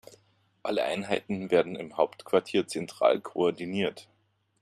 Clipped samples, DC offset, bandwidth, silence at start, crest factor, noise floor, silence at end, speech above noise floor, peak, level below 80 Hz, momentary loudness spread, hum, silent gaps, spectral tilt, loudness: under 0.1%; under 0.1%; 14 kHz; 0.1 s; 20 dB; -67 dBFS; 0.6 s; 39 dB; -8 dBFS; -72 dBFS; 7 LU; none; none; -5 dB/octave; -29 LUFS